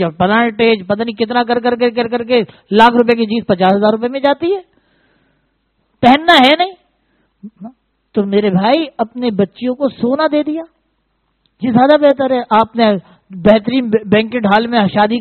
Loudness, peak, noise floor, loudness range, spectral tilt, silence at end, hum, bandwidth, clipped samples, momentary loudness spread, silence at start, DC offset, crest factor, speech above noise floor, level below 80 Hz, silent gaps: -13 LUFS; 0 dBFS; -64 dBFS; 4 LU; -7 dB/octave; 0 s; none; 10 kHz; 0.2%; 10 LU; 0 s; under 0.1%; 14 dB; 52 dB; -48 dBFS; none